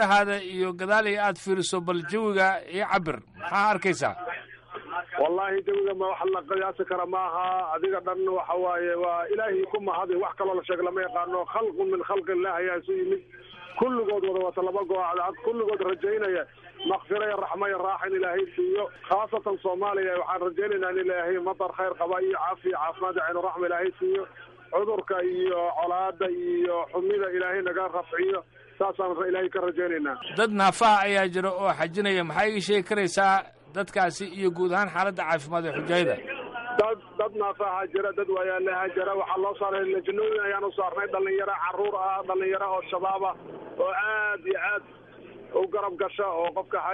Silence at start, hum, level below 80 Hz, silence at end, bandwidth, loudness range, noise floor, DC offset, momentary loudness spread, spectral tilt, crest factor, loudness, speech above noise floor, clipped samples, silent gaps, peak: 0 s; none; -66 dBFS; 0 s; 11 kHz; 4 LU; -47 dBFS; under 0.1%; 6 LU; -4.5 dB/octave; 16 dB; -27 LUFS; 20 dB; under 0.1%; none; -12 dBFS